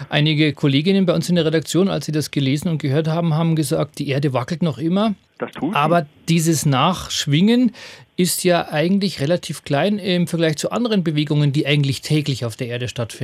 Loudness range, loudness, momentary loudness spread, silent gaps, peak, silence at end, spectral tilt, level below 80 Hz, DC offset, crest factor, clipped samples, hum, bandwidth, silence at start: 2 LU; -19 LUFS; 6 LU; none; -2 dBFS; 0 s; -5.5 dB/octave; -54 dBFS; under 0.1%; 18 dB; under 0.1%; none; 15.5 kHz; 0 s